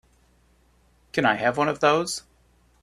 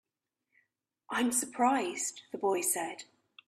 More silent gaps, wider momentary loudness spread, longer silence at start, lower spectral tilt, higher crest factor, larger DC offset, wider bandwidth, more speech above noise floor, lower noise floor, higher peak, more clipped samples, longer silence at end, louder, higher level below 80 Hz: neither; about the same, 9 LU vs 8 LU; about the same, 1.15 s vs 1.1 s; first, -4 dB/octave vs -2 dB/octave; about the same, 22 dB vs 18 dB; neither; about the same, 14.5 kHz vs 15.5 kHz; second, 39 dB vs 54 dB; second, -61 dBFS vs -86 dBFS; first, -4 dBFS vs -16 dBFS; neither; first, 0.6 s vs 0.45 s; first, -23 LUFS vs -31 LUFS; first, -60 dBFS vs -80 dBFS